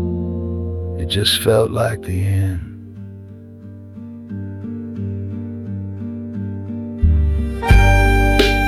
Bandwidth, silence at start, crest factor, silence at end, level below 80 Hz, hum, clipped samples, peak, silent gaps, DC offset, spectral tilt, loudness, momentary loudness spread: 15.5 kHz; 0 s; 16 dB; 0 s; -22 dBFS; none; under 0.1%; -2 dBFS; none; under 0.1%; -5.5 dB/octave; -19 LUFS; 21 LU